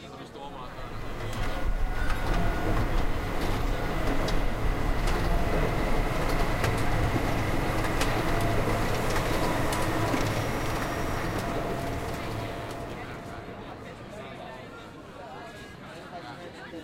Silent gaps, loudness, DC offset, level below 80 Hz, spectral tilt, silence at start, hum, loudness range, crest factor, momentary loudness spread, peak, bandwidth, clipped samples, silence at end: none; -30 LUFS; under 0.1%; -32 dBFS; -5.5 dB/octave; 0 s; none; 11 LU; 16 dB; 14 LU; -12 dBFS; 16 kHz; under 0.1%; 0 s